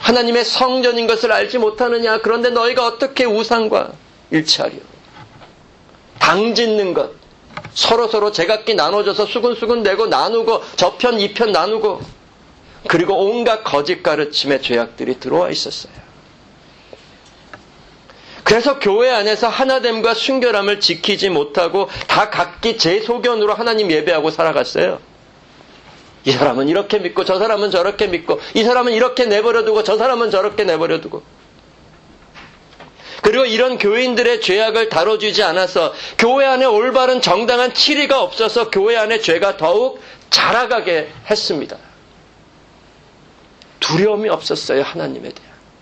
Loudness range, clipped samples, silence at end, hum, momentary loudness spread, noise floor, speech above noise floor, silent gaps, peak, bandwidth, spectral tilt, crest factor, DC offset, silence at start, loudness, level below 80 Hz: 6 LU; under 0.1%; 0.5 s; none; 6 LU; -46 dBFS; 31 dB; none; 0 dBFS; 8.8 kHz; -3.5 dB/octave; 16 dB; under 0.1%; 0 s; -15 LUFS; -52 dBFS